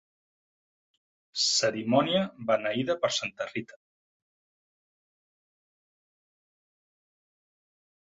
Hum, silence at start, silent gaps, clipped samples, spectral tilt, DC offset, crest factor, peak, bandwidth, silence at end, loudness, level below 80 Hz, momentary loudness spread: none; 1.35 s; none; under 0.1%; -3 dB/octave; under 0.1%; 24 dB; -10 dBFS; 8.4 kHz; 4.55 s; -27 LUFS; -74 dBFS; 11 LU